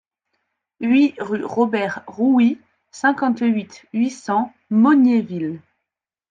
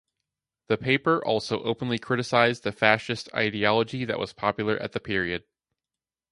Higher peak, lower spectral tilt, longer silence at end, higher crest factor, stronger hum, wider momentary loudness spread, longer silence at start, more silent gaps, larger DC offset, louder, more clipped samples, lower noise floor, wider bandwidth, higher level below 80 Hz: about the same, -4 dBFS vs -2 dBFS; about the same, -6.5 dB/octave vs -5.5 dB/octave; second, 0.7 s vs 0.9 s; second, 16 dB vs 24 dB; neither; first, 12 LU vs 8 LU; about the same, 0.8 s vs 0.7 s; neither; neither; first, -19 LUFS vs -25 LUFS; neither; second, -84 dBFS vs under -90 dBFS; second, 9 kHz vs 11.5 kHz; second, -70 dBFS vs -58 dBFS